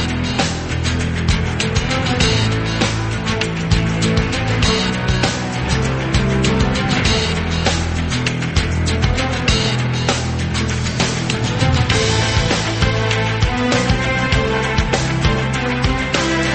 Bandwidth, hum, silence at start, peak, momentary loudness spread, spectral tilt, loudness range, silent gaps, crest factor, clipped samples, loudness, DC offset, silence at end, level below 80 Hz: 8.8 kHz; none; 0 s; -2 dBFS; 4 LU; -4.5 dB/octave; 1 LU; none; 16 dB; under 0.1%; -17 LUFS; under 0.1%; 0 s; -26 dBFS